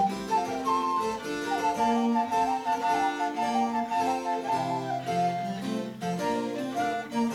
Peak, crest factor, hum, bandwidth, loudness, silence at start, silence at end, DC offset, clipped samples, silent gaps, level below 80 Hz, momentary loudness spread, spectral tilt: -14 dBFS; 14 dB; none; 17 kHz; -28 LUFS; 0 s; 0 s; under 0.1%; under 0.1%; none; -64 dBFS; 6 LU; -5 dB/octave